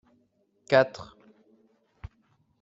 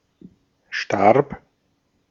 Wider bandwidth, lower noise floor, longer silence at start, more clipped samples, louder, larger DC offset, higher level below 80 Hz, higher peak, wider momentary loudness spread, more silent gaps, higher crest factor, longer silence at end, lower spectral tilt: about the same, 7.8 kHz vs 7.4 kHz; about the same, -69 dBFS vs -68 dBFS; about the same, 0.7 s vs 0.7 s; neither; second, -24 LUFS vs -20 LUFS; neither; about the same, -58 dBFS vs -58 dBFS; second, -6 dBFS vs -2 dBFS; first, 26 LU vs 16 LU; neither; about the same, 24 dB vs 22 dB; first, 1.6 s vs 0.75 s; second, -3.5 dB/octave vs -6 dB/octave